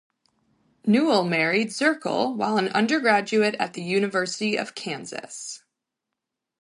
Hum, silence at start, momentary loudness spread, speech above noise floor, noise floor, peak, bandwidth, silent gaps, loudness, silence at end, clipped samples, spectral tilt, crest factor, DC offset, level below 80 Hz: none; 0.85 s; 14 LU; 61 dB; -84 dBFS; -6 dBFS; 11.5 kHz; none; -23 LUFS; 1.05 s; under 0.1%; -4.5 dB/octave; 18 dB; under 0.1%; -74 dBFS